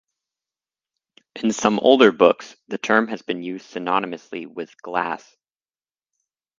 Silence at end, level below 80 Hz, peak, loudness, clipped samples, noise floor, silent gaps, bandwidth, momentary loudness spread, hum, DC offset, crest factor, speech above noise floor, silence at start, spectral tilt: 1.4 s; -66 dBFS; 0 dBFS; -20 LUFS; under 0.1%; under -90 dBFS; none; 7.6 kHz; 19 LU; none; under 0.1%; 22 dB; over 70 dB; 1.35 s; -4 dB/octave